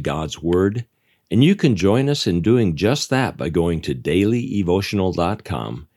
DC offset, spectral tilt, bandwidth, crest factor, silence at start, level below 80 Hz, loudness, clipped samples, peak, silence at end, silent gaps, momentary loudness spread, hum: under 0.1%; -6.5 dB/octave; 13.5 kHz; 16 dB; 0 s; -46 dBFS; -19 LUFS; under 0.1%; -2 dBFS; 0.15 s; none; 8 LU; none